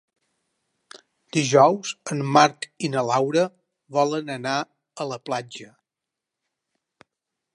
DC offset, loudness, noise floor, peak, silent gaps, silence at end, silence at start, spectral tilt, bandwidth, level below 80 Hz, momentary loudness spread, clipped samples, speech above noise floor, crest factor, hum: under 0.1%; -22 LUFS; -86 dBFS; -2 dBFS; none; 1.9 s; 1.35 s; -4.5 dB/octave; 11.5 kHz; -76 dBFS; 15 LU; under 0.1%; 64 dB; 22 dB; none